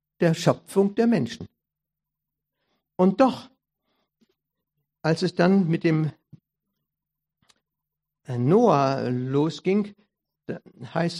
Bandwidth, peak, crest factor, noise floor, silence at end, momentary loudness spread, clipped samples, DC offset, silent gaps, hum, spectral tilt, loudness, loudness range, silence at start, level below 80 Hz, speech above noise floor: 13.5 kHz; -4 dBFS; 22 dB; -87 dBFS; 0 s; 18 LU; under 0.1%; under 0.1%; none; none; -7 dB/octave; -23 LUFS; 3 LU; 0.2 s; -68 dBFS; 65 dB